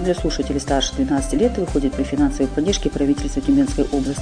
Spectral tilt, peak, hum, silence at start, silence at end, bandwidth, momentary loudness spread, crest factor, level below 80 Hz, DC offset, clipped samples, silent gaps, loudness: -5 dB/octave; -6 dBFS; none; 0 s; 0 s; 10 kHz; 4 LU; 14 dB; -28 dBFS; 0.2%; under 0.1%; none; -20 LUFS